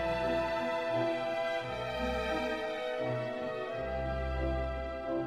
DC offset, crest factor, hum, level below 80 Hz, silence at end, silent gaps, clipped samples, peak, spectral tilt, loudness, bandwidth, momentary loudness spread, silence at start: under 0.1%; 14 dB; none; -44 dBFS; 0 s; none; under 0.1%; -20 dBFS; -6 dB/octave; -34 LUFS; 13.5 kHz; 5 LU; 0 s